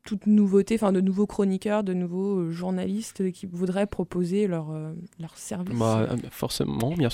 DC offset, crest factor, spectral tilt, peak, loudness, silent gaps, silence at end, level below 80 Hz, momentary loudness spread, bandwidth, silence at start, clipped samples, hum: under 0.1%; 16 dB; -7 dB/octave; -10 dBFS; -26 LUFS; none; 0 s; -54 dBFS; 12 LU; 15.5 kHz; 0.05 s; under 0.1%; none